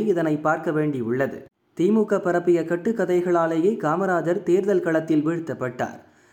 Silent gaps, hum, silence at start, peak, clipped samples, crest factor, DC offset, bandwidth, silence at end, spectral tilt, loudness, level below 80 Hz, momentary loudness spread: none; none; 0 s; -8 dBFS; under 0.1%; 14 dB; under 0.1%; 9.2 kHz; 0.3 s; -7.5 dB/octave; -22 LUFS; -66 dBFS; 8 LU